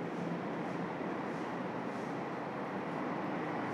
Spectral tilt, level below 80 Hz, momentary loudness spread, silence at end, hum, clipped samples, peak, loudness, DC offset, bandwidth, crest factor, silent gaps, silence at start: -7 dB/octave; -80 dBFS; 2 LU; 0 s; none; under 0.1%; -26 dBFS; -39 LUFS; under 0.1%; 12.5 kHz; 12 dB; none; 0 s